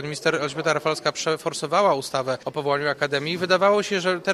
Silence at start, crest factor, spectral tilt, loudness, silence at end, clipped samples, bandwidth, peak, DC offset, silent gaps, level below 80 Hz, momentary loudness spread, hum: 0 s; 16 dB; -4 dB/octave; -23 LUFS; 0 s; under 0.1%; 15 kHz; -6 dBFS; under 0.1%; none; -66 dBFS; 7 LU; none